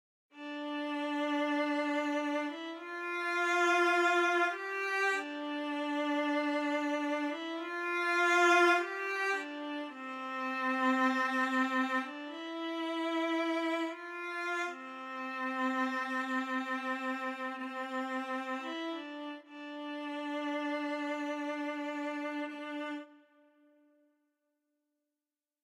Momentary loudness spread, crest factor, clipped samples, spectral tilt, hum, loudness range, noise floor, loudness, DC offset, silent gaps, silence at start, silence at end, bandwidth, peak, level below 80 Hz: 13 LU; 18 dB; under 0.1%; -1.5 dB/octave; none; 9 LU; under -90 dBFS; -33 LUFS; under 0.1%; none; 0.35 s; 2.45 s; 15.5 kHz; -16 dBFS; under -90 dBFS